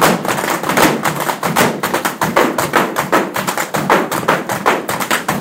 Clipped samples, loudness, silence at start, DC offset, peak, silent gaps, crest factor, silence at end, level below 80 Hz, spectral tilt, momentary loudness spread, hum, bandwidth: under 0.1%; -15 LUFS; 0 s; under 0.1%; 0 dBFS; none; 16 dB; 0 s; -50 dBFS; -3.5 dB/octave; 5 LU; none; 17 kHz